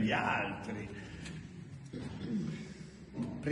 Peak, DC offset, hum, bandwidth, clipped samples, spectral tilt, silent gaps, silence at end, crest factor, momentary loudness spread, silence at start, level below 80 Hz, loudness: -20 dBFS; under 0.1%; none; 11 kHz; under 0.1%; -6 dB/octave; none; 0 s; 18 dB; 15 LU; 0 s; -60 dBFS; -39 LUFS